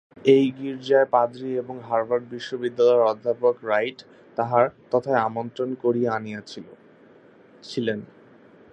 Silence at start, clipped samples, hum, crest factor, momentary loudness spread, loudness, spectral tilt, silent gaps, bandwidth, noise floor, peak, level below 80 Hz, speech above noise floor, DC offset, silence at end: 0.25 s; under 0.1%; none; 20 dB; 14 LU; -23 LUFS; -6.5 dB/octave; none; 8.4 kHz; -52 dBFS; -4 dBFS; -70 dBFS; 29 dB; under 0.1%; 0.7 s